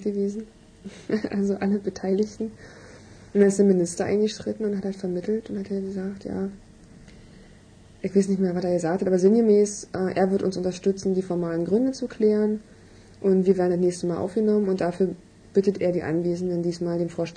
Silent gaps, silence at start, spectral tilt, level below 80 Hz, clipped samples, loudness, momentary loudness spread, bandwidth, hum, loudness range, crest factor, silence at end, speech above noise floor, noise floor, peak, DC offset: none; 0 s; -7 dB/octave; -56 dBFS; under 0.1%; -24 LUFS; 11 LU; 10 kHz; none; 6 LU; 18 dB; 0 s; 27 dB; -50 dBFS; -6 dBFS; under 0.1%